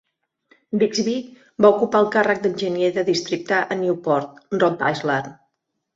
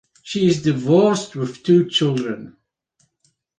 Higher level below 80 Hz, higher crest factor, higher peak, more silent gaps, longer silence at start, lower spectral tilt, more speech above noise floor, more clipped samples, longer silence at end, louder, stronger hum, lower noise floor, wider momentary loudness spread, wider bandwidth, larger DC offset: about the same, -64 dBFS vs -60 dBFS; about the same, 20 dB vs 16 dB; about the same, -2 dBFS vs -4 dBFS; neither; first, 0.7 s vs 0.25 s; about the same, -5 dB/octave vs -6 dB/octave; first, 55 dB vs 48 dB; neither; second, 0.6 s vs 1.1 s; about the same, -20 LUFS vs -18 LUFS; neither; first, -75 dBFS vs -66 dBFS; second, 9 LU vs 13 LU; second, 7.8 kHz vs 9.6 kHz; neither